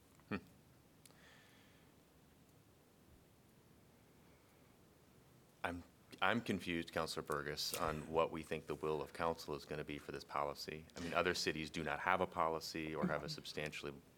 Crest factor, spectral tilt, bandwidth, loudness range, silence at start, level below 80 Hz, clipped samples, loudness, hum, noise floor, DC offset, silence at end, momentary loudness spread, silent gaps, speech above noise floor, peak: 28 dB; -4 dB/octave; 19 kHz; 14 LU; 0.3 s; -68 dBFS; under 0.1%; -42 LUFS; none; -68 dBFS; under 0.1%; 0.05 s; 11 LU; none; 26 dB; -16 dBFS